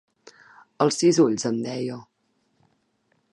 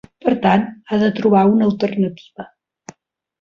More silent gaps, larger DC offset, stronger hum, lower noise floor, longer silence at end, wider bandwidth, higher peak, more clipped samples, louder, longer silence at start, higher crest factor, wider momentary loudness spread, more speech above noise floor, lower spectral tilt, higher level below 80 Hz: neither; neither; neither; first, -70 dBFS vs -59 dBFS; first, 1.3 s vs 0.95 s; first, 11.5 kHz vs 7 kHz; second, -6 dBFS vs -2 dBFS; neither; second, -23 LUFS vs -17 LUFS; first, 0.8 s vs 0.25 s; about the same, 20 dB vs 16 dB; second, 14 LU vs 18 LU; first, 49 dB vs 43 dB; second, -5 dB/octave vs -8 dB/octave; second, -74 dBFS vs -56 dBFS